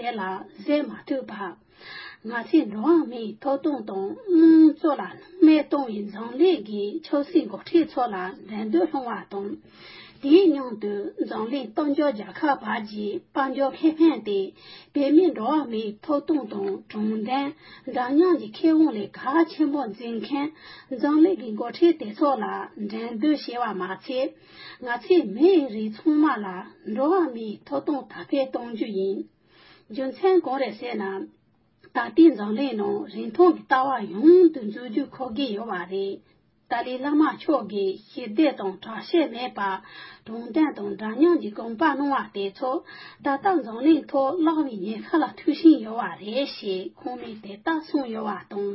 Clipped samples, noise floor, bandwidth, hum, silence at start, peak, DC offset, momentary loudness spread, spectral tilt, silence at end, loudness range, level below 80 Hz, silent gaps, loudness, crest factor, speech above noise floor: under 0.1%; -60 dBFS; 5.8 kHz; none; 0 s; -6 dBFS; under 0.1%; 14 LU; -10 dB/octave; 0 s; 6 LU; -72 dBFS; none; -24 LUFS; 18 dB; 37 dB